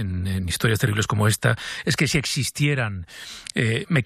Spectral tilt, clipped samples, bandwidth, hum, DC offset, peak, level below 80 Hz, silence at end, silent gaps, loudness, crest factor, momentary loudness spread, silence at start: -4.5 dB/octave; under 0.1%; 15.5 kHz; none; under 0.1%; -4 dBFS; -46 dBFS; 0 s; none; -22 LUFS; 18 dB; 8 LU; 0 s